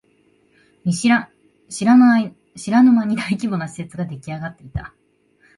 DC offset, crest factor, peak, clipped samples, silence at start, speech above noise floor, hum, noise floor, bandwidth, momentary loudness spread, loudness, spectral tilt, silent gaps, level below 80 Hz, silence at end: under 0.1%; 16 dB; -2 dBFS; under 0.1%; 0.85 s; 42 dB; none; -59 dBFS; 11.5 kHz; 19 LU; -17 LUFS; -5.5 dB/octave; none; -48 dBFS; 0.7 s